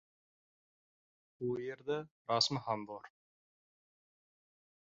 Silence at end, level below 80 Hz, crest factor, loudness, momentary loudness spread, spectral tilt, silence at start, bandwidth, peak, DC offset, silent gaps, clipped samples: 1.8 s; -80 dBFS; 26 dB; -37 LUFS; 12 LU; -3 dB/octave; 1.4 s; 7.4 kHz; -16 dBFS; under 0.1%; 2.11-2.25 s; under 0.1%